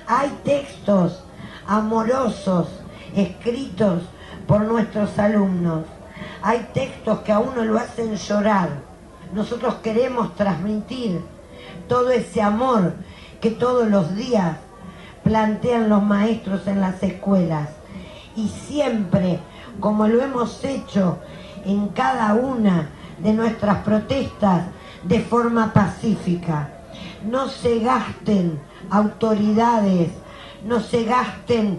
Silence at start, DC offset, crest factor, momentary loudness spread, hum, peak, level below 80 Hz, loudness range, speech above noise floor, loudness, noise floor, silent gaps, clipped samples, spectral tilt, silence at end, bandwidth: 0 s; under 0.1%; 18 dB; 15 LU; none; -2 dBFS; -46 dBFS; 2 LU; 20 dB; -21 LUFS; -39 dBFS; none; under 0.1%; -7 dB/octave; 0 s; 11 kHz